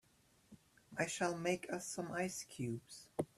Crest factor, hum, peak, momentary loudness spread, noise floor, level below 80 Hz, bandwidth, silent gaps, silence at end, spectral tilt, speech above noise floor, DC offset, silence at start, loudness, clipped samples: 20 dB; none; -22 dBFS; 9 LU; -72 dBFS; -76 dBFS; 14 kHz; none; 0.1 s; -4 dB/octave; 30 dB; under 0.1%; 0.5 s; -42 LUFS; under 0.1%